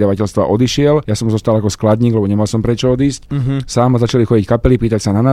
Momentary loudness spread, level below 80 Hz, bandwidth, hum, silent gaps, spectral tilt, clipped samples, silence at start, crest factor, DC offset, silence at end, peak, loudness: 4 LU; -32 dBFS; 13.5 kHz; none; none; -7 dB/octave; under 0.1%; 0 s; 12 dB; under 0.1%; 0 s; 0 dBFS; -14 LUFS